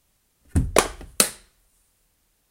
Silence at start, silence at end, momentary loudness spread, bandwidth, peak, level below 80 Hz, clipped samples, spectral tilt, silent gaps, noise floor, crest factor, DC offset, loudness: 0.55 s; 1.15 s; 7 LU; 16.5 kHz; -2 dBFS; -36 dBFS; under 0.1%; -3 dB/octave; none; -67 dBFS; 26 dB; under 0.1%; -23 LUFS